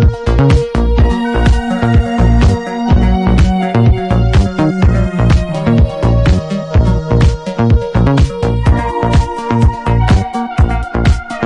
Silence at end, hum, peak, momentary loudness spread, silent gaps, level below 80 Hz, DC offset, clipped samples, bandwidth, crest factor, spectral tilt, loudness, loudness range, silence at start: 0 s; none; -2 dBFS; 3 LU; none; -16 dBFS; under 0.1%; under 0.1%; 10 kHz; 10 dB; -7.5 dB/octave; -12 LUFS; 1 LU; 0 s